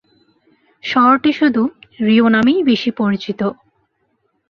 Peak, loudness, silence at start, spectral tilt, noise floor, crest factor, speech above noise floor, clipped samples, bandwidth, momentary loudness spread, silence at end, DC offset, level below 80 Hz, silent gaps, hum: -2 dBFS; -15 LUFS; 0.85 s; -6.5 dB/octave; -66 dBFS; 14 dB; 51 dB; under 0.1%; 6.6 kHz; 10 LU; 0.95 s; under 0.1%; -58 dBFS; none; none